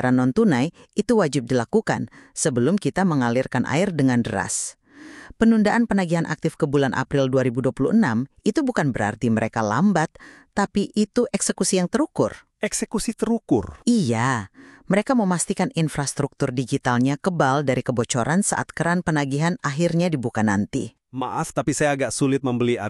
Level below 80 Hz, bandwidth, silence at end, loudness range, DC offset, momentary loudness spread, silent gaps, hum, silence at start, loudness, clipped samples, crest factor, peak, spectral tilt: -50 dBFS; 13 kHz; 0 s; 2 LU; under 0.1%; 6 LU; none; none; 0 s; -22 LUFS; under 0.1%; 18 dB; -4 dBFS; -5.5 dB/octave